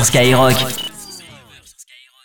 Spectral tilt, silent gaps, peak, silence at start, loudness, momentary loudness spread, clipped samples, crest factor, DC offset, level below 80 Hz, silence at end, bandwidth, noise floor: -3.5 dB/octave; none; 0 dBFS; 0 s; -13 LUFS; 22 LU; under 0.1%; 16 dB; under 0.1%; -44 dBFS; 0 s; over 20 kHz; -45 dBFS